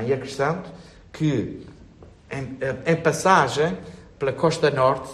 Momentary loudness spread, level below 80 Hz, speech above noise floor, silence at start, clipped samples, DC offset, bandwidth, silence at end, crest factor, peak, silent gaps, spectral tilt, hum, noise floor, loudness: 17 LU; -54 dBFS; 25 dB; 0 s; under 0.1%; under 0.1%; 13 kHz; 0 s; 20 dB; -2 dBFS; none; -5.5 dB/octave; none; -47 dBFS; -22 LUFS